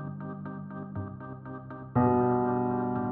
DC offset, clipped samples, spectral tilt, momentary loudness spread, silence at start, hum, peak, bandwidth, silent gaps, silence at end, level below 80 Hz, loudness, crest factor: under 0.1%; under 0.1%; -10.5 dB/octave; 17 LU; 0 s; none; -12 dBFS; 3.2 kHz; none; 0 s; -58 dBFS; -30 LUFS; 18 dB